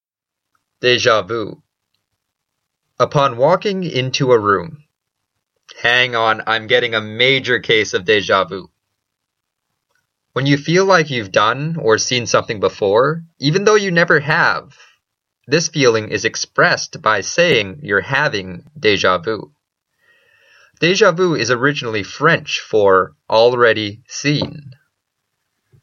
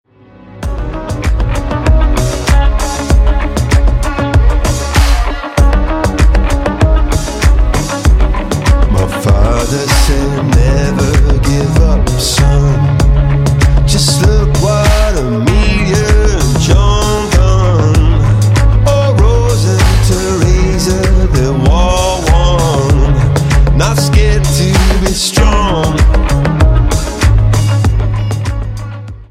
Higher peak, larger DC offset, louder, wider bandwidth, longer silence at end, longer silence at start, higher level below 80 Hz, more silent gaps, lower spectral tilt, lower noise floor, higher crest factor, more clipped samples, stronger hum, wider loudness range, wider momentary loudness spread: about the same, 0 dBFS vs 0 dBFS; neither; second, -15 LUFS vs -11 LUFS; second, 7.4 kHz vs 15 kHz; first, 1.1 s vs 0.05 s; first, 0.85 s vs 0.45 s; second, -58 dBFS vs -12 dBFS; neither; second, -4 dB/octave vs -5.5 dB/octave; first, -82 dBFS vs -37 dBFS; first, 16 dB vs 8 dB; neither; neither; about the same, 4 LU vs 2 LU; first, 8 LU vs 5 LU